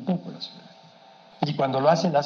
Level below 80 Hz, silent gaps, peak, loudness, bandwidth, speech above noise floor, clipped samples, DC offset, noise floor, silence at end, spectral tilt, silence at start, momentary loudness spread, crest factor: -76 dBFS; none; -6 dBFS; -24 LUFS; 7.2 kHz; 28 dB; under 0.1%; under 0.1%; -51 dBFS; 0 s; -6.5 dB/octave; 0 s; 17 LU; 18 dB